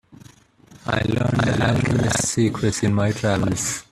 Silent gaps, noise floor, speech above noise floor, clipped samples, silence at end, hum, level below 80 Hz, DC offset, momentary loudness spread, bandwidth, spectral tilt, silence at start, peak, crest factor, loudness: none; -50 dBFS; 30 dB; under 0.1%; 0.1 s; none; -44 dBFS; under 0.1%; 4 LU; 14 kHz; -5 dB/octave; 0.7 s; -4 dBFS; 18 dB; -21 LUFS